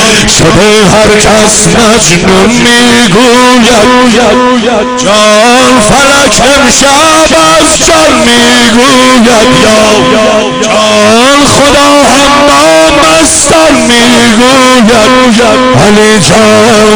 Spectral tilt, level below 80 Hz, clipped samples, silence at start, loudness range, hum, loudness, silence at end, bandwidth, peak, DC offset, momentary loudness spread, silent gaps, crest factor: -3 dB/octave; -24 dBFS; 20%; 0 s; 1 LU; none; -2 LUFS; 0 s; over 20 kHz; 0 dBFS; under 0.1%; 2 LU; none; 2 dB